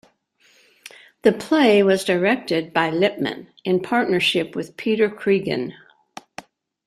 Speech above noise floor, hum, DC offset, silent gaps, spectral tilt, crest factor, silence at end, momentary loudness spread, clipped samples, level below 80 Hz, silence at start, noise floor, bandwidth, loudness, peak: 40 dB; none; under 0.1%; none; -5 dB/octave; 18 dB; 1.15 s; 14 LU; under 0.1%; -64 dBFS; 1.25 s; -59 dBFS; 14 kHz; -20 LUFS; -2 dBFS